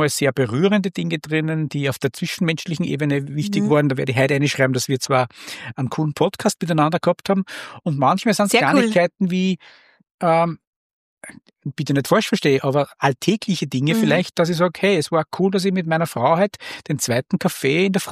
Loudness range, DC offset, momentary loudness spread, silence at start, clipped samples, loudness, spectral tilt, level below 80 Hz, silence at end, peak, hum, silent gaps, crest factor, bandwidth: 3 LU; under 0.1%; 7 LU; 0 s; under 0.1%; -20 LUFS; -5.5 dB/octave; -62 dBFS; 0 s; -2 dBFS; none; 10.11-10.18 s, 10.67-11.17 s; 18 dB; 15.5 kHz